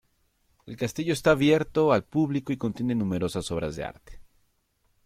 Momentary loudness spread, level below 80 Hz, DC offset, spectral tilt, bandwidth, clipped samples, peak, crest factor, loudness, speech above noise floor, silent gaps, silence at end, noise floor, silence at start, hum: 12 LU; -52 dBFS; under 0.1%; -6 dB/octave; 15.5 kHz; under 0.1%; -10 dBFS; 18 dB; -26 LUFS; 45 dB; none; 0.85 s; -70 dBFS; 0.65 s; none